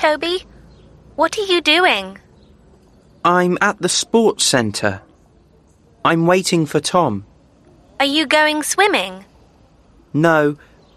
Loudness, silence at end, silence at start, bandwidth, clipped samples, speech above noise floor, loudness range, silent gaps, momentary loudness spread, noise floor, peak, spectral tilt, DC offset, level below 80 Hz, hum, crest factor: -16 LUFS; 0.4 s; 0 s; 13.5 kHz; under 0.1%; 35 dB; 2 LU; none; 11 LU; -51 dBFS; 0 dBFS; -3.5 dB/octave; under 0.1%; -54 dBFS; none; 18 dB